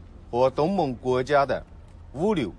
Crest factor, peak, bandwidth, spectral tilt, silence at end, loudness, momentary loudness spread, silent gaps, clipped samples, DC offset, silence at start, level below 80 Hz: 16 dB; -8 dBFS; 10.5 kHz; -7 dB/octave; 0 s; -25 LUFS; 9 LU; none; under 0.1%; under 0.1%; 0 s; -46 dBFS